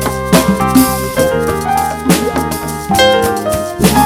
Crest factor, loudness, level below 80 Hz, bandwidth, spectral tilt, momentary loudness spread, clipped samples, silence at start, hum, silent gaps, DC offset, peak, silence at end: 12 dB; -12 LUFS; -30 dBFS; over 20 kHz; -4.5 dB/octave; 6 LU; 0.2%; 0 s; none; none; under 0.1%; 0 dBFS; 0 s